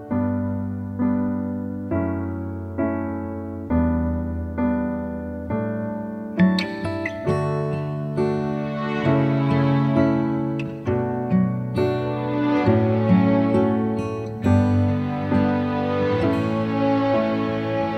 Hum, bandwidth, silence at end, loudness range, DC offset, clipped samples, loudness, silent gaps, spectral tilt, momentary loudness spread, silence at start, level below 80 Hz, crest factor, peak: none; 9.4 kHz; 0 s; 5 LU; under 0.1%; under 0.1%; -22 LUFS; none; -9 dB/octave; 9 LU; 0 s; -42 dBFS; 16 dB; -4 dBFS